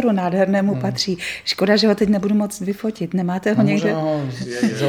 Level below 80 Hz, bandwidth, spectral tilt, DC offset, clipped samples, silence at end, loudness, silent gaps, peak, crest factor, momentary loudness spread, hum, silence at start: -54 dBFS; 15 kHz; -5.5 dB/octave; under 0.1%; under 0.1%; 0 s; -19 LUFS; none; -2 dBFS; 18 dB; 8 LU; none; 0 s